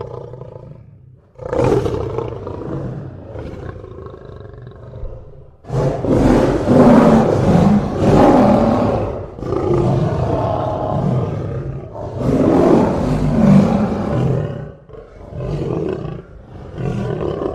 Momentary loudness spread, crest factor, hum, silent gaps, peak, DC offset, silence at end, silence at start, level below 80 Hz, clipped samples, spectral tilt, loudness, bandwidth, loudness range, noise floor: 22 LU; 16 dB; none; none; 0 dBFS; under 0.1%; 0 s; 0 s; -32 dBFS; under 0.1%; -8.5 dB/octave; -16 LUFS; 11 kHz; 12 LU; -44 dBFS